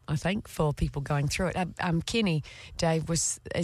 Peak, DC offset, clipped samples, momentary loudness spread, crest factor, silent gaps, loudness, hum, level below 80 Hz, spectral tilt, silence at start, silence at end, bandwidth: -14 dBFS; under 0.1%; under 0.1%; 4 LU; 14 dB; none; -29 LUFS; none; -44 dBFS; -4.5 dB/octave; 0.1 s; 0 s; 14 kHz